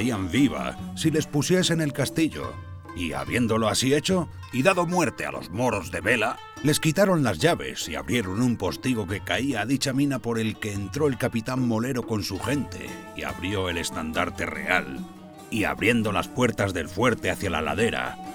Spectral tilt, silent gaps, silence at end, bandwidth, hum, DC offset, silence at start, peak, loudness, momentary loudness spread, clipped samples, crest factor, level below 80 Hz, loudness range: -5 dB/octave; none; 0 s; over 20 kHz; none; under 0.1%; 0 s; -6 dBFS; -25 LUFS; 9 LU; under 0.1%; 20 dB; -48 dBFS; 4 LU